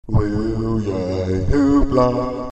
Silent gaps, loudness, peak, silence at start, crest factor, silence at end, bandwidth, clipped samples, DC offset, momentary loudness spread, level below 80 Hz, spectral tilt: none; -19 LUFS; -4 dBFS; 0.05 s; 14 dB; 0 s; 8.4 kHz; under 0.1%; under 0.1%; 7 LU; -28 dBFS; -8.5 dB/octave